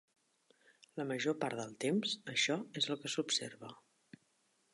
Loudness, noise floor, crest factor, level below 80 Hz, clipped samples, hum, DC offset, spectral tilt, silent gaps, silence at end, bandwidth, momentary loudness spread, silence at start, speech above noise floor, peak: -37 LUFS; -77 dBFS; 20 dB; -88 dBFS; under 0.1%; none; under 0.1%; -3 dB/octave; none; 1 s; 11.5 kHz; 14 LU; 0.95 s; 39 dB; -20 dBFS